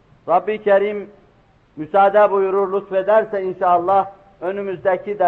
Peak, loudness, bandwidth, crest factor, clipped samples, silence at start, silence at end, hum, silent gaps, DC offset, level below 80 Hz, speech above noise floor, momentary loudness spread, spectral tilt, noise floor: -4 dBFS; -18 LUFS; 4.3 kHz; 14 dB; under 0.1%; 0.25 s; 0 s; none; none; under 0.1%; -60 dBFS; 37 dB; 12 LU; -8 dB/octave; -54 dBFS